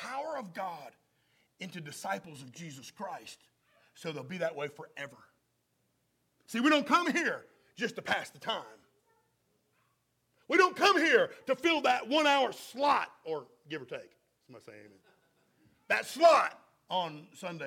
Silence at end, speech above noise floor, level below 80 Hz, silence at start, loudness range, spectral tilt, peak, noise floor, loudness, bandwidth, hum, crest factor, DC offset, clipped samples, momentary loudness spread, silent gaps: 0 s; 46 dB; -82 dBFS; 0 s; 15 LU; -3.5 dB/octave; -10 dBFS; -77 dBFS; -30 LUFS; 17 kHz; none; 24 dB; under 0.1%; under 0.1%; 20 LU; none